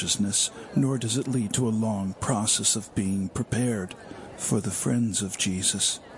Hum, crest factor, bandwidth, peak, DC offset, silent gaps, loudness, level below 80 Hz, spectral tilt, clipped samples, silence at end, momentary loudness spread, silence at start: none; 16 dB; 11.5 kHz; -10 dBFS; under 0.1%; none; -26 LUFS; -56 dBFS; -3.5 dB/octave; under 0.1%; 0 s; 7 LU; 0 s